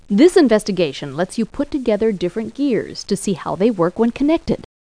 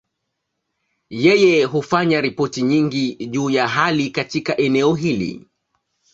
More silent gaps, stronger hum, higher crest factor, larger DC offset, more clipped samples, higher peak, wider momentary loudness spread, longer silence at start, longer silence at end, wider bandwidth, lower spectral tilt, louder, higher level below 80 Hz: neither; neither; about the same, 16 dB vs 18 dB; first, 0.2% vs under 0.1%; neither; about the same, 0 dBFS vs -2 dBFS; about the same, 10 LU vs 9 LU; second, 0.1 s vs 1.1 s; second, 0.2 s vs 0.75 s; first, 10.5 kHz vs 8 kHz; about the same, -6 dB/octave vs -5.5 dB/octave; about the same, -18 LUFS vs -18 LUFS; first, -44 dBFS vs -58 dBFS